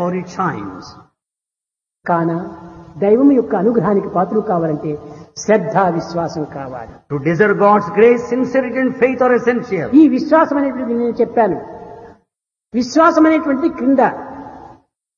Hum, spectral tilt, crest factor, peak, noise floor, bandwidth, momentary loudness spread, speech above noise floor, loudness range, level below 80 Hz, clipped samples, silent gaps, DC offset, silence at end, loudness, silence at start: none; -7 dB/octave; 16 dB; 0 dBFS; -86 dBFS; 7.2 kHz; 18 LU; 72 dB; 5 LU; -54 dBFS; under 0.1%; none; under 0.1%; 0.45 s; -15 LUFS; 0 s